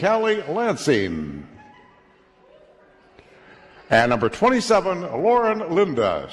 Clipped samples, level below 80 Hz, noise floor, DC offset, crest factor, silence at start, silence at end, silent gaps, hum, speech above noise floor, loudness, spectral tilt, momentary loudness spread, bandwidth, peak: under 0.1%; -52 dBFS; -55 dBFS; under 0.1%; 18 dB; 0 s; 0 s; none; none; 35 dB; -20 LUFS; -5 dB/octave; 8 LU; 12 kHz; -4 dBFS